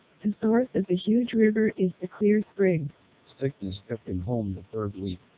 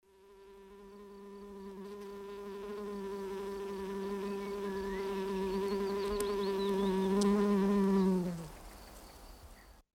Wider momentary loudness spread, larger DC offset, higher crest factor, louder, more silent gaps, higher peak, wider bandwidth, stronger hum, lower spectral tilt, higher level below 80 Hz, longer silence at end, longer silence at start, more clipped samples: second, 11 LU vs 23 LU; neither; about the same, 16 dB vs 18 dB; first, -27 LUFS vs -35 LUFS; neither; first, -10 dBFS vs -18 dBFS; second, 4 kHz vs 16.5 kHz; neither; first, -11.5 dB/octave vs -6.5 dB/octave; first, -52 dBFS vs -58 dBFS; about the same, 0.2 s vs 0.2 s; about the same, 0.25 s vs 0.25 s; neither